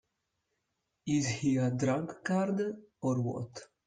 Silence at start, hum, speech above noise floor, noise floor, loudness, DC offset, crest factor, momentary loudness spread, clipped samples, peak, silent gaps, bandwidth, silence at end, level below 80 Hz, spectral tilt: 1.05 s; none; 51 dB; -83 dBFS; -32 LUFS; under 0.1%; 16 dB; 9 LU; under 0.1%; -18 dBFS; none; 9.6 kHz; 0.2 s; -68 dBFS; -6 dB/octave